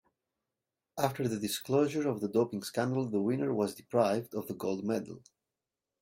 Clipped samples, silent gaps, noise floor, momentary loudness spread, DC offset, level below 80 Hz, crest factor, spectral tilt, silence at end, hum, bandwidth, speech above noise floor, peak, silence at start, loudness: under 0.1%; none; -90 dBFS; 7 LU; under 0.1%; -74 dBFS; 20 dB; -6 dB/octave; 0.85 s; none; 16 kHz; 58 dB; -14 dBFS; 0.95 s; -32 LUFS